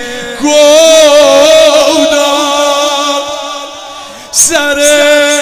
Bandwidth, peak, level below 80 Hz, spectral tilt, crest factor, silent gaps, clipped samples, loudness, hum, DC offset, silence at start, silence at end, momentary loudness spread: over 20 kHz; 0 dBFS; -44 dBFS; -0.5 dB/octave; 8 dB; none; 3%; -6 LUFS; none; under 0.1%; 0 s; 0 s; 16 LU